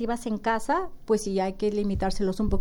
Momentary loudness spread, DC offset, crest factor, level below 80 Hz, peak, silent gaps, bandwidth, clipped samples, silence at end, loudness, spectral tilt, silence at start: 3 LU; under 0.1%; 14 dB; -36 dBFS; -12 dBFS; none; 17.5 kHz; under 0.1%; 0 s; -27 LUFS; -6 dB/octave; 0 s